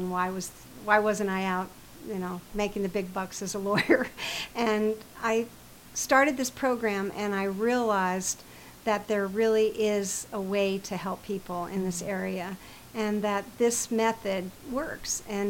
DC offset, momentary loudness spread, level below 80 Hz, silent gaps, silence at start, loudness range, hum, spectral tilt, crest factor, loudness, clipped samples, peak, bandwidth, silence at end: under 0.1%; 11 LU; -56 dBFS; none; 0 s; 4 LU; none; -4 dB/octave; 22 dB; -29 LUFS; under 0.1%; -8 dBFS; 17 kHz; 0 s